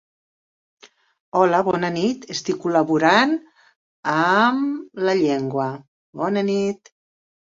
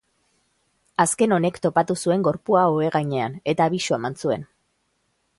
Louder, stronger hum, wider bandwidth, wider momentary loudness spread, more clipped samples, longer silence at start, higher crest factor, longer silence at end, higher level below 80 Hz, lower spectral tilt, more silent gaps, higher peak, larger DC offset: about the same, -20 LUFS vs -22 LUFS; neither; second, 7.8 kHz vs 11.5 kHz; first, 11 LU vs 7 LU; neither; first, 1.35 s vs 1 s; about the same, 20 dB vs 18 dB; second, 0.8 s vs 0.95 s; about the same, -66 dBFS vs -62 dBFS; about the same, -5.5 dB/octave vs -5 dB/octave; first, 3.76-4.03 s, 5.88-6.13 s vs none; about the same, -2 dBFS vs -4 dBFS; neither